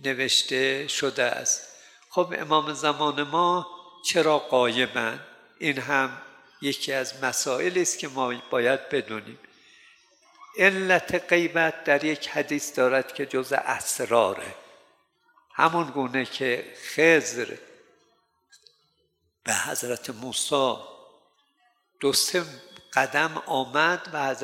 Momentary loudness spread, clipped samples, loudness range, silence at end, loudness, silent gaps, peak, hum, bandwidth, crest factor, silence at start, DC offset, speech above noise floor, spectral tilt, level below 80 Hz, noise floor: 10 LU; under 0.1%; 4 LU; 0 s; -25 LUFS; none; -4 dBFS; none; 16.5 kHz; 22 dB; 0 s; under 0.1%; 47 dB; -2.5 dB/octave; -72 dBFS; -72 dBFS